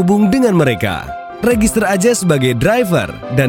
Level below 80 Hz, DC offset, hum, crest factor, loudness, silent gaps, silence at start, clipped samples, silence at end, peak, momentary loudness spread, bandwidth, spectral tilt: -36 dBFS; under 0.1%; none; 12 dB; -14 LUFS; none; 0 s; under 0.1%; 0 s; 0 dBFS; 7 LU; 17 kHz; -5.5 dB/octave